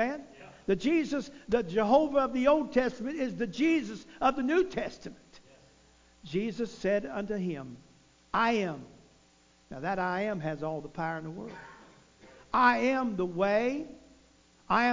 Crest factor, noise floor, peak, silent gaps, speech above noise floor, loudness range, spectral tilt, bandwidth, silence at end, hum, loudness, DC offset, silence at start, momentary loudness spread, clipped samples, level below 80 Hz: 20 dB; -63 dBFS; -12 dBFS; none; 33 dB; 8 LU; -6 dB/octave; 7.6 kHz; 0 s; none; -30 LUFS; under 0.1%; 0 s; 17 LU; under 0.1%; -60 dBFS